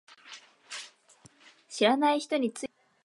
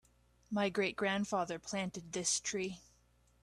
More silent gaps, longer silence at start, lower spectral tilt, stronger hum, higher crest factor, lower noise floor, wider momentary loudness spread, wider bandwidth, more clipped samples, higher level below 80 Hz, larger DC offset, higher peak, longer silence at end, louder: neither; second, 0.25 s vs 0.5 s; about the same, -3 dB/octave vs -3 dB/octave; neither; about the same, 20 dB vs 16 dB; second, -60 dBFS vs -70 dBFS; first, 24 LU vs 7 LU; about the same, 11.5 kHz vs 12.5 kHz; neither; second, -80 dBFS vs -70 dBFS; neither; first, -10 dBFS vs -22 dBFS; second, 0.4 s vs 0.6 s; first, -27 LUFS vs -36 LUFS